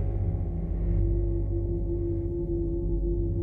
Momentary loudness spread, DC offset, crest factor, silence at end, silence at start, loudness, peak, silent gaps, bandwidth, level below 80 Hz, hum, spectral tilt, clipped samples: 3 LU; under 0.1%; 10 dB; 0 s; 0 s; -30 LUFS; -16 dBFS; none; 2.3 kHz; -30 dBFS; none; -13.5 dB/octave; under 0.1%